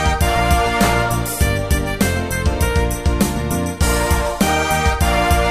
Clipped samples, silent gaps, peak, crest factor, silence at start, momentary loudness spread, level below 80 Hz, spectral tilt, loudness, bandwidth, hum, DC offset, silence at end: under 0.1%; none; -2 dBFS; 14 dB; 0 s; 4 LU; -22 dBFS; -4.5 dB/octave; -17 LUFS; 15.5 kHz; none; under 0.1%; 0 s